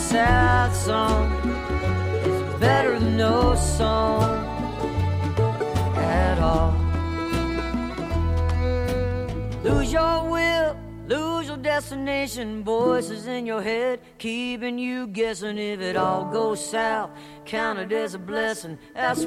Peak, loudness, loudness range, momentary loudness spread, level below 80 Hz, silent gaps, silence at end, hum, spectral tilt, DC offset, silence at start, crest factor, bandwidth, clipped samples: -6 dBFS; -24 LUFS; 4 LU; 8 LU; -32 dBFS; none; 0 s; none; -5.5 dB/octave; under 0.1%; 0 s; 18 dB; 15 kHz; under 0.1%